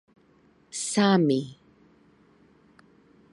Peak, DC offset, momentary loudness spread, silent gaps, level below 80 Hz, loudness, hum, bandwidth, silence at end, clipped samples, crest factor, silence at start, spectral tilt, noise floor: -8 dBFS; under 0.1%; 17 LU; none; -72 dBFS; -24 LUFS; none; 11.5 kHz; 1.8 s; under 0.1%; 20 dB; 0.75 s; -5 dB/octave; -61 dBFS